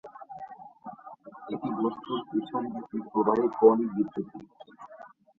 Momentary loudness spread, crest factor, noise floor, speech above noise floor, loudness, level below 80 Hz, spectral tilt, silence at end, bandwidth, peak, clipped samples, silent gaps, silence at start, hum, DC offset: 26 LU; 22 dB; -47 dBFS; 20 dB; -28 LUFS; -70 dBFS; -9 dB/octave; 0.3 s; 4.2 kHz; -8 dBFS; under 0.1%; none; 0.05 s; none; under 0.1%